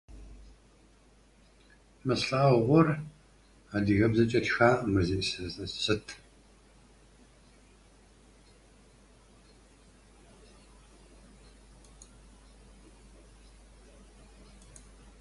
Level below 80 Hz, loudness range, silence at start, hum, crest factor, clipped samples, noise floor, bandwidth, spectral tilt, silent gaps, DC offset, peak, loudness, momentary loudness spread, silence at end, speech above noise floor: -52 dBFS; 12 LU; 0.1 s; none; 24 dB; under 0.1%; -61 dBFS; 11.5 kHz; -6 dB/octave; none; under 0.1%; -8 dBFS; -27 LUFS; 23 LU; 9.05 s; 34 dB